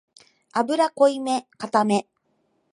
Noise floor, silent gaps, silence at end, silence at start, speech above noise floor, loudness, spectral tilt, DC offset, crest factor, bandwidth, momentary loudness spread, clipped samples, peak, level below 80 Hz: -69 dBFS; none; 0.7 s; 0.55 s; 48 dB; -22 LUFS; -5 dB/octave; under 0.1%; 20 dB; 11 kHz; 8 LU; under 0.1%; -4 dBFS; -76 dBFS